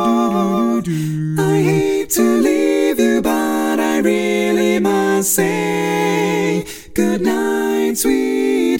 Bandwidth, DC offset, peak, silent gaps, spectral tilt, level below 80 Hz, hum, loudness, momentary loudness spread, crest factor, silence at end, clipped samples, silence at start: 17 kHz; under 0.1%; -2 dBFS; none; -5 dB/octave; -48 dBFS; none; -16 LUFS; 4 LU; 14 dB; 0 s; under 0.1%; 0 s